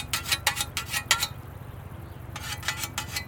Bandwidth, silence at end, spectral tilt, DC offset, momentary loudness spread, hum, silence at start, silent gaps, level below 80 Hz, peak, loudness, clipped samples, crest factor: over 20 kHz; 0 s; -1 dB/octave; under 0.1%; 17 LU; none; 0 s; none; -48 dBFS; -4 dBFS; -27 LUFS; under 0.1%; 28 dB